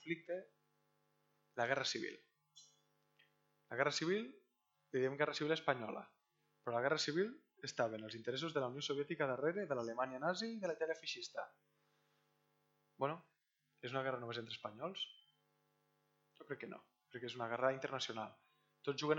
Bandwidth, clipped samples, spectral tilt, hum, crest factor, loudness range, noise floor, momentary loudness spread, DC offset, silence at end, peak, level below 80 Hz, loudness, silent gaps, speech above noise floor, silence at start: 18.5 kHz; under 0.1%; -4 dB/octave; none; 26 dB; 7 LU; -84 dBFS; 13 LU; under 0.1%; 0 s; -18 dBFS; under -90 dBFS; -42 LUFS; none; 43 dB; 0 s